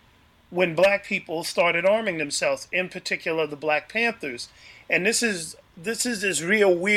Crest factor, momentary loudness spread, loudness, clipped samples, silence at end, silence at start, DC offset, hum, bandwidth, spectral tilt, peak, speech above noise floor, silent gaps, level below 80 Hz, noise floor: 18 dB; 13 LU; -23 LUFS; under 0.1%; 0 s; 0.5 s; under 0.1%; none; 16 kHz; -3 dB/octave; -6 dBFS; 33 dB; none; -64 dBFS; -57 dBFS